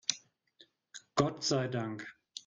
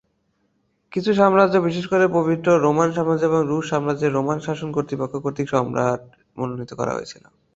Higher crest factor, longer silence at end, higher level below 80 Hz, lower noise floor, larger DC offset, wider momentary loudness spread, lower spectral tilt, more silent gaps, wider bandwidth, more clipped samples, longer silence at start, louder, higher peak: first, 26 dB vs 20 dB; second, 0.05 s vs 0.4 s; second, -68 dBFS vs -58 dBFS; about the same, -66 dBFS vs -68 dBFS; neither; first, 18 LU vs 12 LU; second, -4 dB/octave vs -6.5 dB/octave; neither; first, 9.6 kHz vs 8 kHz; neither; second, 0.1 s vs 0.9 s; second, -34 LUFS vs -21 LUFS; second, -10 dBFS vs -2 dBFS